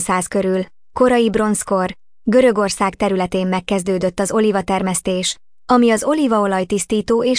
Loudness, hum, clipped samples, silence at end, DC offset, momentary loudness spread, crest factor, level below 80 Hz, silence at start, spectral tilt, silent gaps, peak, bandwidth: -17 LUFS; none; under 0.1%; 0 s; under 0.1%; 7 LU; 14 dB; -46 dBFS; 0 s; -4.5 dB/octave; none; -4 dBFS; 10.5 kHz